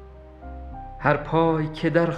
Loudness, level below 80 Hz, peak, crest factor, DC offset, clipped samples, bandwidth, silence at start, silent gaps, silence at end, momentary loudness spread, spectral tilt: -23 LUFS; -42 dBFS; -4 dBFS; 20 dB; under 0.1%; under 0.1%; 8.6 kHz; 0 s; none; 0 s; 19 LU; -8.5 dB/octave